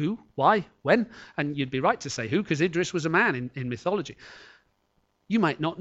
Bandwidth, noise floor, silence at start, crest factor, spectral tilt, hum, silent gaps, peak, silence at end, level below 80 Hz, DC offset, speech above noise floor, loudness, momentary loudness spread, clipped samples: 8.2 kHz; -71 dBFS; 0 s; 20 dB; -5.5 dB/octave; none; none; -6 dBFS; 0 s; -64 dBFS; under 0.1%; 45 dB; -26 LUFS; 9 LU; under 0.1%